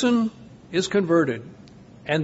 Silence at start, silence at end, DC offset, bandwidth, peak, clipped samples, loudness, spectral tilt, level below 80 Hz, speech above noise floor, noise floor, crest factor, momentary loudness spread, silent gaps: 0 s; 0 s; under 0.1%; 8 kHz; -8 dBFS; under 0.1%; -23 LUFS; -5.5 dB/octave; -60 dBFS; 24 dB; -46 dBFS; 16 dB; 16 LU; none